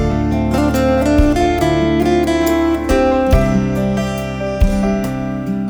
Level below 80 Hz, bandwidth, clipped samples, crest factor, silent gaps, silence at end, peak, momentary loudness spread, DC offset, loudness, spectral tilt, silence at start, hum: -22 dBFS; over 20 kHz; under 0.1%; 14 dB; none; 0 s; 0 dBFS; 7 LU; under 0.1%; -15 LUFS; -7 dB/octave; 0 s; none